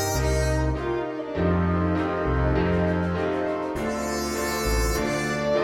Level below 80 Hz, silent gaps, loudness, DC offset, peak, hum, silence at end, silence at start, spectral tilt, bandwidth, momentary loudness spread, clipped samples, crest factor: -32 dBFS; none; -25 LUFS; under 0.1%; -12 dBFS; none; 0 s; 0 s; -5.5 dB/octave; 17 kHz; 5 LU; under 0.1%; 12 dB